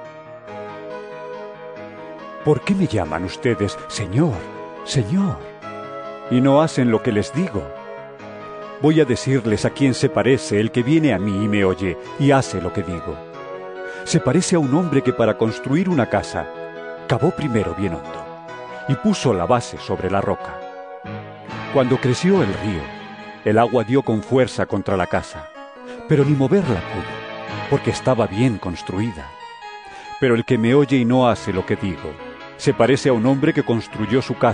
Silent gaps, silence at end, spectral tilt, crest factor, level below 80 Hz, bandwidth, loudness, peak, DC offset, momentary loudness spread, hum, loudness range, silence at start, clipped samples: none; 0 s; -6.5 dB/octave; 18 dB; -48 dBFS; 10 kHz; -19 LUFS; -2 dBFS; under 0.1%; 18 LU; none; 4 LU; 0 s; under 0.1%